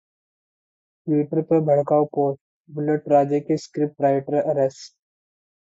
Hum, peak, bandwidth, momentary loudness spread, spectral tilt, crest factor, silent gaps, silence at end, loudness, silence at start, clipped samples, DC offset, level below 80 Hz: none; -6 dBFS; 7.8 kHz; 9 LU; -8 dB/octave; 16 dB; 2.41-2.64 s; 0.9 s; -21 LUFS; 1.05 s; under 0.1%; under 0.1%; -70 dBFS